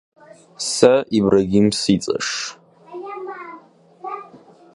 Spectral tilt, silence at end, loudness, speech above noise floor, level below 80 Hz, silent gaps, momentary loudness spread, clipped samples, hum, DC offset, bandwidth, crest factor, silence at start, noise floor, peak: -4.5 dB/octave; 0.4 s; -18 LUFS; 29 dB; -52 dBFS; none; 20 LU; under 0.1%; none; under 0.1%; 11.5 kHz; 20 dB; 0.6 s; -46 dBFS; 0 dBFS